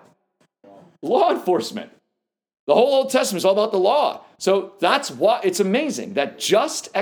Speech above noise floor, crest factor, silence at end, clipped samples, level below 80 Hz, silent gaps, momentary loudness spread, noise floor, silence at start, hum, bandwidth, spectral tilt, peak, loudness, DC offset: 60 dB; 20 dB; 0 s; under 0.1%; -78 dBFS; 2.59-2.67 s; 7 LU; -80 dBFS; 1.05 s; none; over 20 kHz; -3.5 dB/octave; -2 dBFS; -20 LUFS; under 0.1%